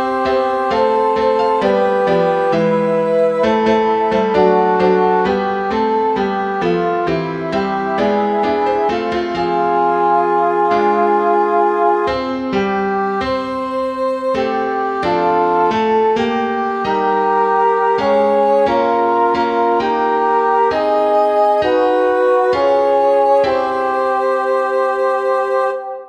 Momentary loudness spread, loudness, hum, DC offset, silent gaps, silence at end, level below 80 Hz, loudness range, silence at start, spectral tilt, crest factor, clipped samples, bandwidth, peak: 5 LU; -15 LUFS; none; under 0.1%; none; 0 s; -48 dBFS; 3 LU; 0 s; -6.5 dB/octave; 14 dB; under 0.1%; 9.4 kHz; -2 dBFS